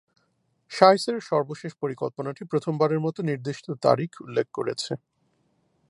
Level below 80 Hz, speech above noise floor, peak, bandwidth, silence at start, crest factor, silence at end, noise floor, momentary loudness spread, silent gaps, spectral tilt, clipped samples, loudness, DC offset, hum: -74 dBFS; 46 dB; 0 dBFS; 11.5 kHz; 0.7 s; 26 dB; 0.95 s; -71 dBFS; 15 LU; none; -6 dB/octave; under 0.1%; -25 LUFS; under 0.1%; none